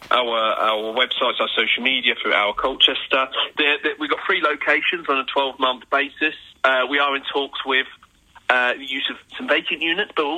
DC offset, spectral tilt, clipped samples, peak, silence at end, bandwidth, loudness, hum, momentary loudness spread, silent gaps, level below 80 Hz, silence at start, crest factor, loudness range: under 0.1%; -3 dB/octave; under 0.1%; 0 dBFS; 0 s; 14.5 kHz; -19 LUFS; none; 6 LU; none; -60 dBFS; 0 s; 20 dB; 3 LU